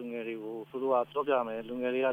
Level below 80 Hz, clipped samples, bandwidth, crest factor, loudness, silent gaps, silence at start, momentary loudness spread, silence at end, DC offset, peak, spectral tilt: -74 dBFS; under 0.1%; 15.5 kHz; 16 dB; -32 LUFS; none; 0 s; 9 LU; 0 s; under 0.1%; -16 dBFS; -7 dB/octave